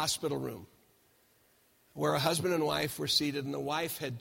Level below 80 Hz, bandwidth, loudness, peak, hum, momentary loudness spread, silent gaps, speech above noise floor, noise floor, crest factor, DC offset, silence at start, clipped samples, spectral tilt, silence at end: -66 dBFS; 16.5 kHz; -32 LUFS; -12 dBFS; none; 10 LU; none; 35 dB; -68 dBFS; 22 dB; under 0.1%; 0 s; under 0.1%; -3.5 dB/octave; 0 s